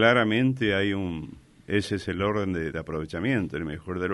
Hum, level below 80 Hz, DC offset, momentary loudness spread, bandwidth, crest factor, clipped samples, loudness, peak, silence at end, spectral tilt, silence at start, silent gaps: none; -50 dBFS; under 0.1%; 10 LU; 11.5 kHz; 20 dB; under 0.1%; -27 LUFS; -8 dBFS; 0 s; -6.5 dB/octave; 0 s; none